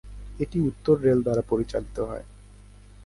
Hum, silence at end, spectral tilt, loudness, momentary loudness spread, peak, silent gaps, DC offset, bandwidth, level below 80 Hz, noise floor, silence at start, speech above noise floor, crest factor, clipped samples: 50 Hz at -40 dBFS; 0 s; -8.5 dB/octave; -25 LUFS; 12 LU; -8 dBFS; none; under 0.1%; 11.5 kHz; -44 dBFS; -48 dBFS; 0.05 s; 24 dB; 18 dB; under 0.1%